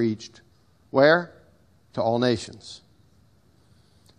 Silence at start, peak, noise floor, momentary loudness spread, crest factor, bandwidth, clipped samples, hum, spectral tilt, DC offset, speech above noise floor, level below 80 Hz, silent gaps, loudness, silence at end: 0 s; -4 dBFS; -60 dBFS; 24 LU; 22 dB; 10.5 kHz; under 0.1%; none; -5.5 dB/octave; under 0.1%; 37 dB; -64 dBFS; none; -23 LUFS; 1.4 s